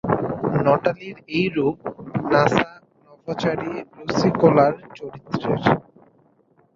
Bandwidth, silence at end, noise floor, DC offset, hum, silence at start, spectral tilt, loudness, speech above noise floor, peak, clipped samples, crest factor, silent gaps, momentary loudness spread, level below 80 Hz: 7.6 kHz; 0.95 s; -59 dBFS; under 0.1%; none; 0.05 s; -7 dB/octave; -21 LUFS; 39 dB; 0 dBFS; under 0.1%; 22 dB; none; 15 LU; -54 dBFS